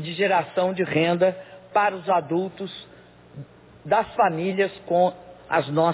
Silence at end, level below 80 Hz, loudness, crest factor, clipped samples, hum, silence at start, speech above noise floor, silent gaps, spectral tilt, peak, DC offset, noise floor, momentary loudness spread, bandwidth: 0 s; -62 dBFS; -23 LUFS; 16 dB; under 0.1%; none; 0 s; 20 dB; none; -10 dB/octave; -8 dBFS; under 0.1%; -43 dBFS; 19 LU; 4 kHz